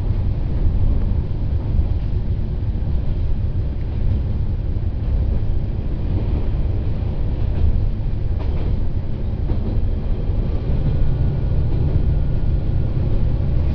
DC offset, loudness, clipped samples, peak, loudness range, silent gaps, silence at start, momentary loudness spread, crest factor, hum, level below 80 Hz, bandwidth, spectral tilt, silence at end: under 0.1%; -23 LUFS; under 0.1%; -6 dBFS; 2 LU; none; 0 s; 4 LU; 12 dB; none; -20 dBFS; 5.4 kHz; -11 dB/octave; 0 s